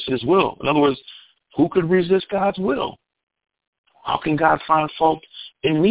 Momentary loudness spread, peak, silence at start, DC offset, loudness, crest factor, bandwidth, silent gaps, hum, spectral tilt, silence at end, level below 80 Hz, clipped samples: 11 LU; -2 dBFS; 0 s; under 0.1%; -20 LUFS; 18 dB; 4 kHz; 3.23-3.27 s, 3.67-3.84 s; none; -10.5 dB/octave; 0 s; -54 dBFS; under 0.1%